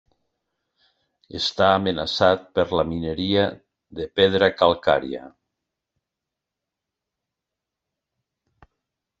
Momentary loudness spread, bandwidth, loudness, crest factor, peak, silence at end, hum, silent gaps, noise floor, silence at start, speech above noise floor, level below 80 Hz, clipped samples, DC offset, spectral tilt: 16 LU; 8 kHz; -21 LUFS; 24 dB; -2 dBFS; 3.9 s; none; none; -85 dBFS; 1.35 s; 64 dB; -56 dBFS; under 0.1%; under 0.1%; -5.5 dB/octave